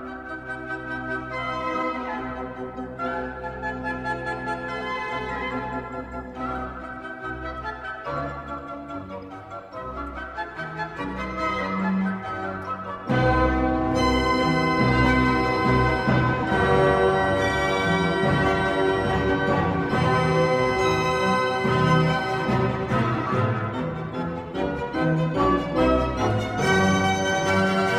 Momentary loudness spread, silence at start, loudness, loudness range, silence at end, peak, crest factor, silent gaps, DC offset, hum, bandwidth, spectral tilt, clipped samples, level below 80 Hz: 13 LU; 0 s; -24 LUFS; 11 LU; 0 s; -8 dBFS; 16 dB; none; under 0.1%; none; 14.5 kHz; -6 dB/octave; under 0.1%; -38 dBFS